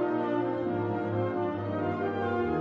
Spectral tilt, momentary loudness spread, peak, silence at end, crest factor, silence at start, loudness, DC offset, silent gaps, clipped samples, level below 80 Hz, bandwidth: -9.5 dB/octave; 2 LU; -18 dBFS; 0 s; 12 dB; 0 s; -30 LUFS; under 0.1%; none; under 0.1%; -58 dBFS; 5.6 kHz